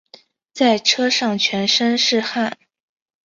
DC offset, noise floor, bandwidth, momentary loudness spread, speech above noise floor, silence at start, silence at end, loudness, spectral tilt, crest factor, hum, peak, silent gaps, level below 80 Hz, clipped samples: under 0.1%; -49 dBFS; 7.6 kHz; 8 LU; 31 dB; 0.55 s; 0.7 s; -17 LUFS; -2.5 dB/octave; 18 dB; none; -2 dBFS; none; -66 dBFS; under 0.1%